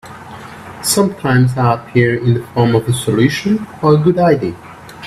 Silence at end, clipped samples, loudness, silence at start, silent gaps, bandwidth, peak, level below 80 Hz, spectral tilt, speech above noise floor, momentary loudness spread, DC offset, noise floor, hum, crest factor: 0 s; under 0.1%; -14 LUFS; 0.05 s; none; 15 kHz; 0 dBFS; -46 dBFS; -6 dB/octave; 19 dB; 20 LU; under 0.1%; -32 dBFS; none; 14 dB